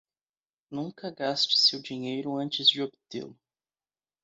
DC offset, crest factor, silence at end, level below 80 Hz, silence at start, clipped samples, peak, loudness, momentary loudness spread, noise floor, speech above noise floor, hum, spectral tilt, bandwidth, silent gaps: under 0.1%; 22 dB; 0.9 s; -78 dBFS; 0.7 s; under 0.1%; -8 dBFS; -25 LUFS; 19 LU; under -90 dBFS; over 61 dB; none; -3.5 dB/octave; 8 kHz; none